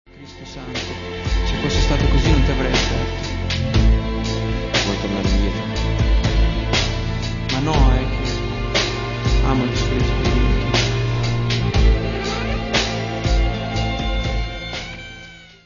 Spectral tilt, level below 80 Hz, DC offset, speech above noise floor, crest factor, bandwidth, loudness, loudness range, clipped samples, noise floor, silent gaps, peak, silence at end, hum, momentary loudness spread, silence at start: -5 dB/octave; -22 dBFS; under 0.1%; 22 dB; 18 dB; 7.4 kHz; -20 LUFS; 2 LU; under 0.1%; -40 dBFS; none; -2 dBFS; 0.2 s; none; 9 LU; 0.15 s